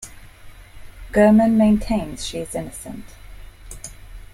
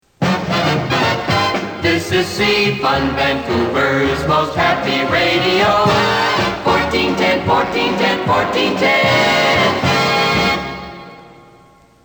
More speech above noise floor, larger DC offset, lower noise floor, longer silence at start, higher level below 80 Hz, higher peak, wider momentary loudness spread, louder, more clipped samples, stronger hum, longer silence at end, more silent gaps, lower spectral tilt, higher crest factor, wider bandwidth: second, 23 dB vs 32 dB; neither; second, -41 dBFS vs -47 dBFS; second, 0 s vs 0.2 s; about the same, -38 dBFS vs -40 dBFS; about the same, -4 dBFS vs -2 dBFS; first, 24 LU vs 5 LU; second, -18 LUFS vs -15 LUFS; neither; neither; second, 0.1 s vs 0.75 s; neither; first, -6 dB/octave vs -4.5 dB/octave; about the same, 18 dB vs 14 dB; second, 15 kHz vs over 20 kHz